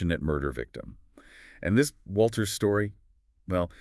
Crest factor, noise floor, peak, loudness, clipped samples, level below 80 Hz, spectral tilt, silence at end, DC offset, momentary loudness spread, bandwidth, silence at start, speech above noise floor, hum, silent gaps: 18 dB; -53 dBFS; -10 dBFS; -28 LUFS; under 0.1%; -48 dBFS; -5.5 dB/octave; 0.1 s; under 0.1%; 13 LU; 12 kHz; 0 s; 25 dB; none; none